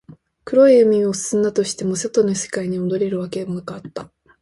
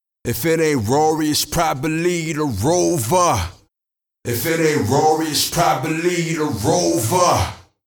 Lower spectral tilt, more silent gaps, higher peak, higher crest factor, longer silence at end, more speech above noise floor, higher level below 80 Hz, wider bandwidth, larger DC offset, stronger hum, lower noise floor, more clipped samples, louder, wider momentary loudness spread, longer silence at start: about the same, -5 dB/octave vs -4.5 dB/octave; neither; about the same, -2 dBFS vs -2 dBFS; about the same, 16 dB vs 16 dB; about the same, 0.35 s vs 0.25 s; second, 22 dB vs 67 dB; second, -58 dBFS vs -44 dBFS; second, 11.5 kHz vs over 20 kHz; neither; neither; second, -40 dBFS vs -85 dBFS; neither; about the same, -18 LUFS vs -18 LUFS; first, 17 LU vs 6 LU; first, 0.45 s vs 0.25 s